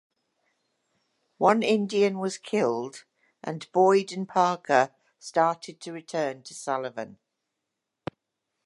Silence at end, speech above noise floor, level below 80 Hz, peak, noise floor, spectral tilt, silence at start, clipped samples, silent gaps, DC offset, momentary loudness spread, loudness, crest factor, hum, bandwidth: 1.55 s; 58 dB; -76 dBFS; -6 dBFS; -84 dBFS; -5 dB/octave; 1.4 s; under 0.1%; none; under 0.1%; 18 LU; -26 LUFS; 22 dB; none; 11.5 kHz